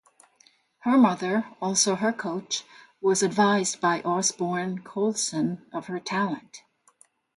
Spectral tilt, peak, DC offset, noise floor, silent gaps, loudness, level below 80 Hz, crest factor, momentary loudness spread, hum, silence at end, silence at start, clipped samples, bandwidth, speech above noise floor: -3.5 dB/octave; -8 dBFS; under 0.1%; -62 dBFS; none; -25 LUFS; -72 dBFS; 18 dB; 10 LU; none; 0.8 s; 0.85 s; under 0.1%; 11.5 kHz; 36 dB